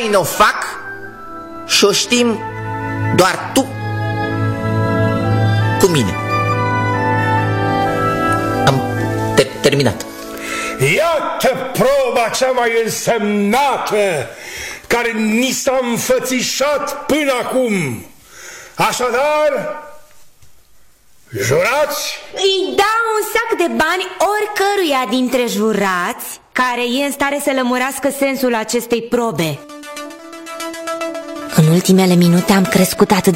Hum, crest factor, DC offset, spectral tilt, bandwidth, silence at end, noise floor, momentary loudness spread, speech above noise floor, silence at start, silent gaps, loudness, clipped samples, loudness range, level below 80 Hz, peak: none; 16 dB; under 0.1%; -4.5 dB/octave; 16.5 kHz; 0 s; -45 dBFS; 13 LU; 30 dB; 0 s; none; -15 LUFS; under 0.1%; 4 LU; -44 dBFS; 0 dBFS